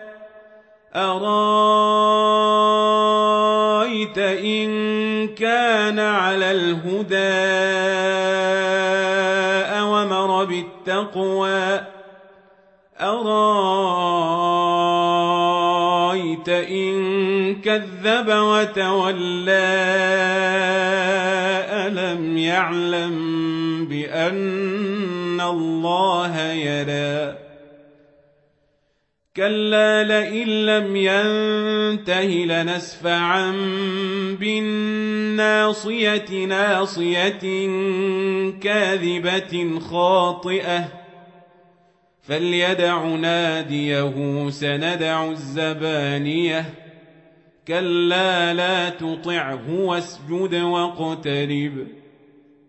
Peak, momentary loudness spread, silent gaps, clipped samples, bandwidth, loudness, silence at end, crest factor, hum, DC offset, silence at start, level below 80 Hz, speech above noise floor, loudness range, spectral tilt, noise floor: -4 dBFS; 7 LU; none; under 0.1%; 8.4 kHz; -20 LUFS; 0.75 s; 16 dB; none; under 0.1%; 0 s; -68 dBFS; 50 dB; 5 LU; -5 dB/octave; -70 dBFS